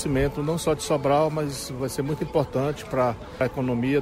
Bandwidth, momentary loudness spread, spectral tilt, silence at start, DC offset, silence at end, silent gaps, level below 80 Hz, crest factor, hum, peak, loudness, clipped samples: 16 kHz; 6 LU; -6 dB/octave; 0 s; under 0.1%; 0 s; none; -44 dBFS; 16 dB; none; -8 dBFS; -25 LUFS; under 0.1%